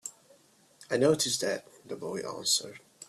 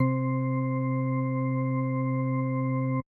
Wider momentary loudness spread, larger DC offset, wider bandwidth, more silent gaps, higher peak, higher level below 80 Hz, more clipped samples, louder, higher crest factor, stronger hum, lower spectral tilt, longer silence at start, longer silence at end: first, 18 LU vs 0 LU; neither; first, 14.5 kHz vs 2.4 kHz; neither; about the same, -12 dBFS vs -14 dBFS; about the same, -72 dBFS vs -74 dBFS; neither; about the same, -29 LUFS vs -28 LUFS; first, 22 dB vs 14 dB; neither; second, -2.5 dB/octave vs -13 dB/octave; about the same, 0.05 s vs 0 s; about the same, 0.05 s vs 0.05 s